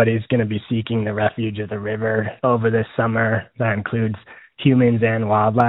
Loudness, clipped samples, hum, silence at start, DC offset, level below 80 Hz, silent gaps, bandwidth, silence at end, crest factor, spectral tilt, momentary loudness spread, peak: -20 LUFS; under 0.1%; none; 0 s; under 0.1%; -56 dBFS; none; 4.1 kHz; 0 s; 18 dB; -6.5 dB/octave; 8 LU; -2 dBFS